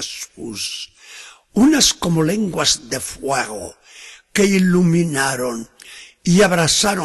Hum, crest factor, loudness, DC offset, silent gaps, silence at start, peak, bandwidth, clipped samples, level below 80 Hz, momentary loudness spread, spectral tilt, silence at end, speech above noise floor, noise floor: none; 18 dB; -17 LUFS; under 0.1%; none; 0 s; -2 dBFS; 12.5 kHz; under 0.1%; -46 dBFS; 22 LU; -4 dB/octave; 0 s; 24 dB; -41 dBFS